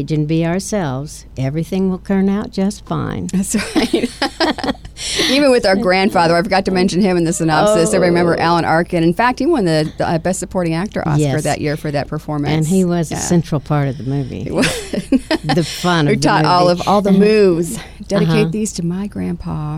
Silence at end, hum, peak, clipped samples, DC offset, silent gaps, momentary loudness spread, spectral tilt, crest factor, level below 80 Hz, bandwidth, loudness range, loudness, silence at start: 0 s; none; -2 dBFS; under 0.1%; under 0.1%; none; 9 LU; -5.5 dB/octave; 12 dB; -38 dBFS; 15.5 kHz; 5 LU; -16 LUFS; 0 s